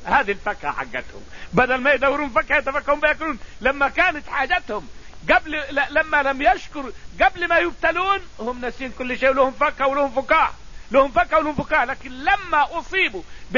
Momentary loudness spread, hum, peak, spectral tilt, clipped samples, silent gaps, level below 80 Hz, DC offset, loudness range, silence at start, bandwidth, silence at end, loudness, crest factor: 12 LU; none; -4 dBFS; -4.5 dB/octave; under 0.1%; none; -40 dBFS; 1%; 2 LU; 0 s; 7.4 kHz; 0 s; -20 LUFS; 18 dB